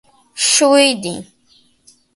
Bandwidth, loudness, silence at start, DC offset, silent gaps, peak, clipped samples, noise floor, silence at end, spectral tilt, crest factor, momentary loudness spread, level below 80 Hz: 12 kHz; -13 LUFS; 0.35 s; under 0.1%; none; 0 dBFS; under 0.1%; -54 dBFS; 0.95 s; -1.5 dB/octave; 16 dB; 20 LU; -62 dBFS